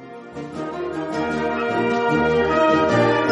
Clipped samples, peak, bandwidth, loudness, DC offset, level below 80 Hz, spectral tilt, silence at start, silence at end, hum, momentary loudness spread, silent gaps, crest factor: under 0.1%; -6 dBFS; 10.5 kHz; -20 LUFS; under 0.1%; -48 dBFS; -6.5 dB/octave; 0 s; 0 s; none; 14 LU; none; 14 dB